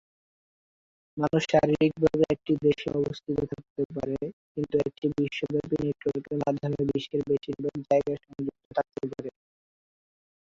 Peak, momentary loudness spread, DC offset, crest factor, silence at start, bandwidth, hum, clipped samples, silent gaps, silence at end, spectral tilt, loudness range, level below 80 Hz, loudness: -8 dBFS; 11 LU; under 0.1%; 20 dB; 1.15 s; 7.6 kHz; none; under 0.1%; 3.70-3.76 s, 3.85-3.90 s, 4.33-4.55 s, 8.65-8.71 s; 1.15 s; -7 dB/octave; 4 LU; -56 dBFS; -28 LUFS